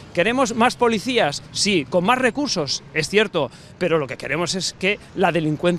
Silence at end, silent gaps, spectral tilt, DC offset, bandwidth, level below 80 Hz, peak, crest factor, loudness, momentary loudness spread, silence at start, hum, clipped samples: 0 s; none; -4 dB/octave; under 0.1%; 13.5 kHz; -52 dBFS; -2 dBFS; 18 dB; -20 LUFS; 5 LU; 0 s; none; under 0.1%